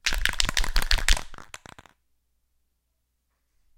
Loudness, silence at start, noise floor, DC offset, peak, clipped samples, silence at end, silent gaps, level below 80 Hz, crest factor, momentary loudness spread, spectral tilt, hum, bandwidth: -25 LUFS; 0.05 s; -75 dBFS; under 0.1%; 0 dBFS; under 0.1%; 2.35 s; none; -30 dBFS; 28 dB; 20 LU; -1 dB/octave; none; 17 kHz